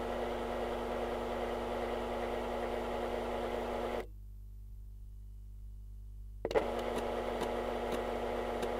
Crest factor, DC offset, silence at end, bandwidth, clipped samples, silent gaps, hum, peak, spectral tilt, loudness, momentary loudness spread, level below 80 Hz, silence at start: 20 dB; under 0.1%; 0 s; 16 kHz; under 0.1%; none; 50 Hz at -50 dBFS; -18 dBFS; -5.5 dB/octave; -37 LUFS; 16 LU; -48 dBFS; 0 s